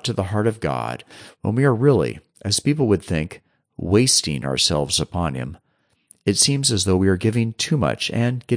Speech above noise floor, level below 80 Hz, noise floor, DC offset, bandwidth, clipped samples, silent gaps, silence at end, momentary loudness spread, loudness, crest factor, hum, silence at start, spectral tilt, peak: 36 dB; -46 dBFS; -56 dBFS; under 0.1%; 10.5 kHz; under 0.1%; none; 0 s; 12 LU; -20 LUFS; 18 dB; none; 0.05 s; -4.5 dB/octave; -4 dBFS